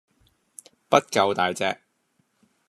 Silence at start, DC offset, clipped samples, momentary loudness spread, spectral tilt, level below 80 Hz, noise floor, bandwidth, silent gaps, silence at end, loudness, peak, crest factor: 0.9 s; under 0.1%; under 0.1%; 8 LU; -3.5 dB/octave; -74 dBFS; -70 dBFS; 13.5 kHz; none; 0.95 s; -23 LUFS; -2 dBFS; 24 dB